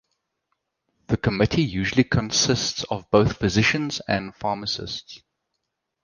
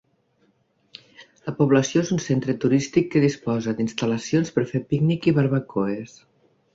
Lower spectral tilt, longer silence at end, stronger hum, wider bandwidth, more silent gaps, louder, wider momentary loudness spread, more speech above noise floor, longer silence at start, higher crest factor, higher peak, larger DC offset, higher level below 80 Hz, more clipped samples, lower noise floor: second, -4.5 dB/octave vs -6.5 dB/octave; first, 0.85 s vs 0.7 s; neither; first, 10.5 kHz vs 7.8 kHz; neither; about the same, -22 LUFS vs -22 LUFS; about the same, 9 LU vs 7 LU; first, 57 dB vs 43 dB; about the same, 1.1 s vs 1.2 s; about the same, 22 dB vs 18 dB; first, -2 dBFS vs -6 dBFS; neither; first, -44 dBFS vs -60 dBFS; neither; first, -79 dBFS vs -65 dBFS